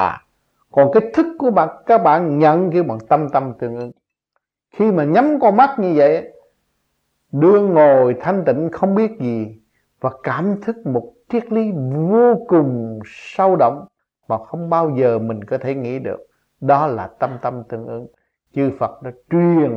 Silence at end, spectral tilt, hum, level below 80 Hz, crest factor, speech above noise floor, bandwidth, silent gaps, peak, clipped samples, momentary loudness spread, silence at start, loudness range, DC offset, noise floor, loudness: 0 s; -9.5 dB/octave; none; -60 dBFS; 16 dB; 57 dB; 7 kHz; none; 0 dBFS; under 0.1%; 15 LU; 0 s; 6 LU; under 0.1%; -73 dBFS; -17 LUFS